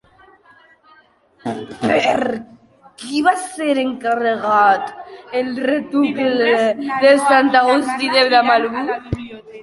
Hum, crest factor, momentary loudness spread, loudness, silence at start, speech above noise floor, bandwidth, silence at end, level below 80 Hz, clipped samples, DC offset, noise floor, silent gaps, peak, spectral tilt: none; 16 dB; 15 LU; -16 LUFS; 1.45 s; 37 dB; 11.5 kHz; 0 s; -50 dBFS; under 0.1%; under 0.1%; -52 dBFS; none; -2 dBFS; -4 dB/octave